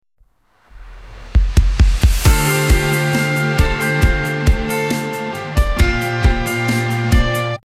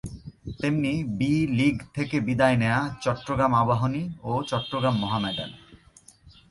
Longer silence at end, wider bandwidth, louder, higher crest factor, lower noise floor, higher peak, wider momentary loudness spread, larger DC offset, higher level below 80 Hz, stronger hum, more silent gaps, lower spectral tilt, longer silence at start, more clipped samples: about the same, 0.1 s vs 0.2 s; first, 16 kHz vs 11.5 kHz; first, -16 LUFS vs -25 LUFS; about the same, 14 dB vs 18 dB; about the same, -55 dBFS vs -55 dBFS; first, 0 dBFS vs -8 dBFS; second, 5 LU vs 10 LU; first, 0.1% vs under 0.1%; first, -18 dBFS vs -50 dBFS; neither; neither; second, -5 dB/octave vs -6.5 dB/octave; first, 0.75 s vs 0.05 s; neither